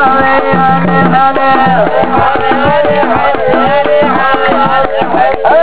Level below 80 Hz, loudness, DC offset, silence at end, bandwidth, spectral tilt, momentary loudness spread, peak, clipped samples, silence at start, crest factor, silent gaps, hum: -36 dBFS; -8 LUFS; 10%; 0 s; 4 kHz; -9.5 dB/octave; 2 LU; 0 dBFS; 0.6%; 0 s; 10 dB; none; none